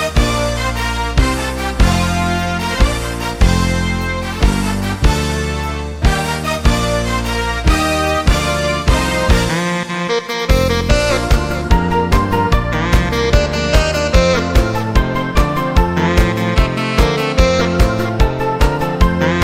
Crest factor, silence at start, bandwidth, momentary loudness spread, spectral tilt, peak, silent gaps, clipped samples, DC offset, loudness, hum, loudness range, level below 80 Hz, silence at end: 14 dB; 0 s; 16 kHz; 4 LU; -5 dB/octave; 0 dBFS; none; under 0.1%; under 0.1%; -15 LUFS; none; 2 LU; -18 dBFS; 0 s